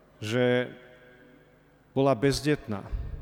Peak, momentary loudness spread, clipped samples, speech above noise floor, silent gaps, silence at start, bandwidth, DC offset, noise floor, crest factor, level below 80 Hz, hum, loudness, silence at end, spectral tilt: -12 dBFS; 12 LU; under 0.1%; 33 dB; none; 0.2 s; 19 kHz; under 0.1%; -59 dBFS; 18 dB; -44 dBFS; 50 Hz at -60 dBFS; -28 LUFS; 0 s; -6 dB/octave